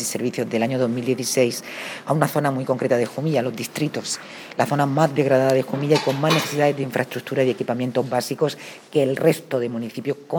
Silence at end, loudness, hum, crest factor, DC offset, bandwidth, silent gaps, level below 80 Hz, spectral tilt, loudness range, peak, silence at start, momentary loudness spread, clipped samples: 0 s; -22 LUFS; none; 20 dB; under 0.1%; over 20 kHz; none; -74 dBFS; -5 dB/octave; 3 LU; -2 dBFS; 0 s; 9 LU; under 0.1%